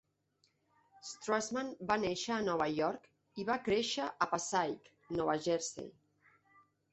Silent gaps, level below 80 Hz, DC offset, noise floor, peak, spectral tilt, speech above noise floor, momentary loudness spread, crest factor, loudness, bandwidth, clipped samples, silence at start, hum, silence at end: none; -70 dBFS; under 0.1%; -77 dBFS; -16 dBFS; -3.5 dB/octave; 42 dB; 15 LU; 22 dB; -36 LUFS; 8.2 kHz; under 0.1%; 1.05 s; none; 1 s